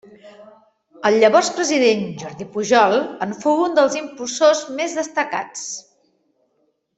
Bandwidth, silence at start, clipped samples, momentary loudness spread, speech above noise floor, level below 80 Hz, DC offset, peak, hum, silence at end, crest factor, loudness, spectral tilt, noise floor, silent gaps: 8.4 kHz; 0.25 s; under 0.1%; 14 LU; 49 dB; -66 dBFS; under 0.1%; -2 dBFS; none; 1.2 s; 18 dB; -18 LUFS; -3 dB/octave; -67 dBFS; none